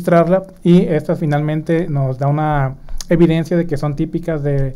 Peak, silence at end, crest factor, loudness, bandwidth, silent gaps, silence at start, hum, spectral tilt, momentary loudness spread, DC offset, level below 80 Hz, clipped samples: -2 dBFS; 0 s; 14 dB; -16 LUFS; 12 kHz; none; 0 s; none; -8 dB/octave; 7 LU; under 0.1%; -32 dBFS; under 0.1%